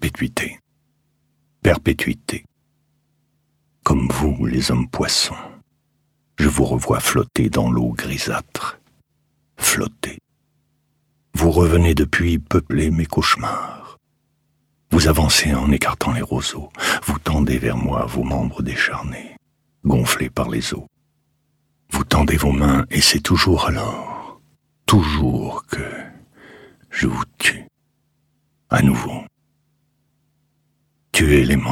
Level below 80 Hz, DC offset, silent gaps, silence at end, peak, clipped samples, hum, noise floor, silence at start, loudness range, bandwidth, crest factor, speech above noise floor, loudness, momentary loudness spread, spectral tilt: -32 dBFS; under 0.1%; none; 0 s; -2 dBFS; under 0.1%; none; -67 dBFS; 0 s; 6 LU; 17 kHz; 18 dB; 49 dB; -19 LUFS; 14 LU; -4.5 dB/octave